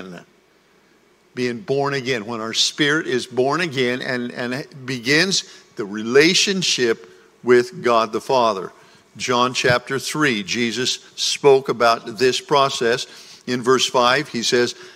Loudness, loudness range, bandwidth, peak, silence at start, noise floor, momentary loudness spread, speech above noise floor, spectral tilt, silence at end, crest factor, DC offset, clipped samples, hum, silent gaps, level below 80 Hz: -19 LUFS; 3 LU; 16 kHz; -2 dBFS; 0 s; -56 dBFS; 12 LU; 37 dB; -3 dB/octave; 0.05 s; 18 dB; under 0.1%; under 0.1%; none; none; -62 dBFS